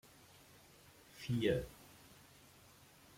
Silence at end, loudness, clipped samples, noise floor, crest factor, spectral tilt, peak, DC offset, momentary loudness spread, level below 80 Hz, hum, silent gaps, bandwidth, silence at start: 1.25 s; -39 LUFS; under 0.1%; -63 dBFS; 22 dB; -6 dB/octave; -22 dBFS; under 0.1%; 25 LU; -64 dBFS; none; none; 16.5 kHz; 1.15 s